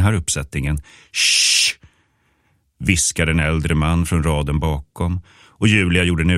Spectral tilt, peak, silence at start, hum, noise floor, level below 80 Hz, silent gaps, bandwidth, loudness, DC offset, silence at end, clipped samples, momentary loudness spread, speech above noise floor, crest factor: -3.5 dB/octave; 0 dBFS; 0 s; none; -63 dBFS; -30 dBFS; none; 16 kHz; -17 LUFS; under 0.1%; 0 s; under 0.1%; 11 LU; 45 dB; 18 dB